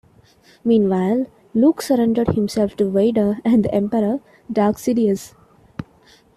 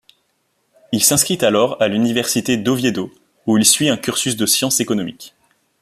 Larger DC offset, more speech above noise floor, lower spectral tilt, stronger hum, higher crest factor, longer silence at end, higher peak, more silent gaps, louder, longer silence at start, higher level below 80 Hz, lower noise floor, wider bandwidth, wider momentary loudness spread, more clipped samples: neither; second, 35 dB vs 49 dB; first, -7 dB/octave vs -3 dB/octave; neither; about the same, 14 dB vs 18 dB; about the same, 0.55 s vs 0.55 s; second, -4 dBFS vs 0 dBFS; neither; second, -19 LUFS vs -16 LUFS; second, 0.65 s vs 0.9 s; first, -50 dBFS vs -56 dBFS; second, -52 dBFS vs -66 dBFS; about the same, 14 kHz vs 15 kHz; about the same, 10 LU vs 11 LU; neither